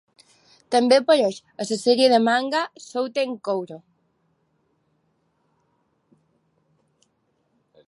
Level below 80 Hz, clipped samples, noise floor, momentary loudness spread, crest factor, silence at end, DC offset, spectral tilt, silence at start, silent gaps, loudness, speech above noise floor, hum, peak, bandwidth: -80 dBFS; under 0.1%; -69 dBFS; 13 LU; 20 dB; 4.1 s; under 0.1%; -3.5 dB/octave; 0.7 s; none; -21 LUFS; 49 dB; none; -4 dBFS; 11.5 kHz